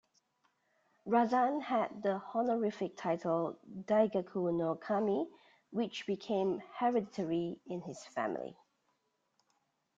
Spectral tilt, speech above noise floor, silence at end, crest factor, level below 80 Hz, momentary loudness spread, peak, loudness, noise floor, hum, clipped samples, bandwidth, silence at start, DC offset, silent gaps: -7 dB/octave; 46 dB; 1.45 s; 18 dB; -78 dBFS; 12 LU; -16 dBFS; -35 LUFS; -80 dBFS; none; under 0.1%; 7.8 kHz; 1.05 s; under 0.1%; none